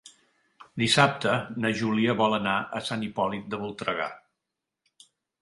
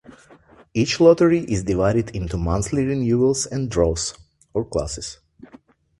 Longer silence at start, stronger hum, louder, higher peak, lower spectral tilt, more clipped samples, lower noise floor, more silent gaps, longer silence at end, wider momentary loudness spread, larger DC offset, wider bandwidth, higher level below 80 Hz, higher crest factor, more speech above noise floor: about the same, 0.05 s vs 0.1 s; neither; second, -26 LUFS vs -21 LUFS; about the same, -4 dBFS vs -2 dBFS; about the same, -4.5 dB/octave vs -5.5 dB/octave; neither; first, -86 dBFS vs -50 dBFS; neither; first, 1.25 s vs 0.85 s; about the same, 11 LU vs 13 LU; neither; about the same, 11.5 kHz vs 11.5 kHz; second, -64 dBFS vs -38 dBFS; about the same, 24 dB vs 20 dB; first, 59 dB vs 31 dB